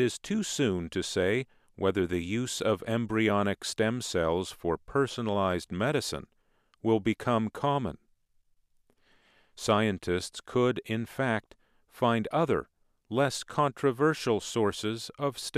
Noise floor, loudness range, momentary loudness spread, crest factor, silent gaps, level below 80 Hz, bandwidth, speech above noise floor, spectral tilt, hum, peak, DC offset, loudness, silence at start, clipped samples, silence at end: -68 dBFS; 3 LU; 7 LU; 20 dB; none; -58 dBFS; 15.5 kHz; 39 dB; -5 dB/octave; none; -10 dBFS; under 0.1%; -30 LUFS; 0 s; under 0.1%; 0 s